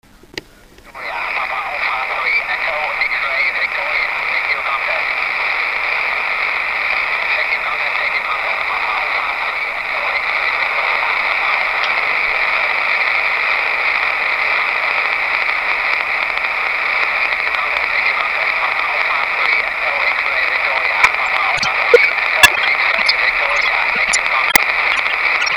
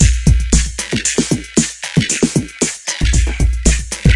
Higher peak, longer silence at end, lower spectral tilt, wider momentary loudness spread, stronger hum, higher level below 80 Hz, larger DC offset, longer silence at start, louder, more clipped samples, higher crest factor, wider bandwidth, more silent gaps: about the same, 0 dBFS vs 0 dBFS; about the same, 0 s vs 0 s; second, 0 dB/octave vs -4 dB/octave; about the same, 5 LU vs 4 LU; neither; second, -48 dBFS vs -18 dBFS; neither; first, 0.35 s vs 0 s; about the same, -15 LUFS vs -16 LUFS; first, 0.1% vs under 0.1%; about the same, 16 dB vs 14 dB; first, 15.5 kHz vs 11.5 kHz; neither